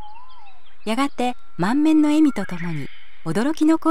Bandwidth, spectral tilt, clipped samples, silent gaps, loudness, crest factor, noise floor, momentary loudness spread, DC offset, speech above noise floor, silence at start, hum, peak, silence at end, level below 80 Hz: 12.5 kHz; -6 dB/octave; under 0.1%; none; -21 LUFS; 12 dB; -51 dBFS; 16 LU; 5%; 31 dB; 0 s; none; -8 dBFS; 0 s; -56 dBFS